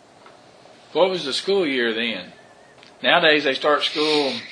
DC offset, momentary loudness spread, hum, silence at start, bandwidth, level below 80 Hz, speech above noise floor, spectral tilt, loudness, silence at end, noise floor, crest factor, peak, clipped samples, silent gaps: under 0.1%; 9 LU; none; 0.95 s; 10.5 kHz; -74 dBFS; 28 dB; -3.5 dB/octave; -20 LUFS; 0 s; -48 dBFS; 20 dB; -2 dBFS; under 0.1%; none